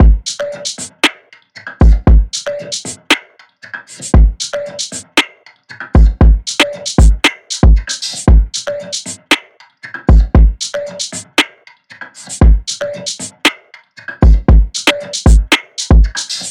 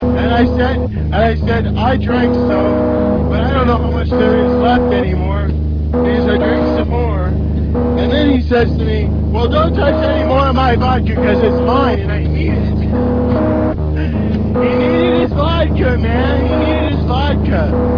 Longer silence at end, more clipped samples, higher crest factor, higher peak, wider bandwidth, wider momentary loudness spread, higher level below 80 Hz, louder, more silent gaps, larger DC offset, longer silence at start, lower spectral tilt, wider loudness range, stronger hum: about the same, 0 s vs 0 s; neither; about the same, 12 dB vs 12 dB; about the same, 0 dBFS vs 0 dBFS; first, 12 kHz vs 5.4 kHz; first, 12 LU vs 4 LU; first, -14 dBFS vs -20 dBFS; about the same, -13 LUFS vs -14 LUFS; neither; neither; about the same, 0 s vs 0 s; second, -4.5 dB/octave vs -9.5 dB/octave; first, 4 LU vs 1 LU; neither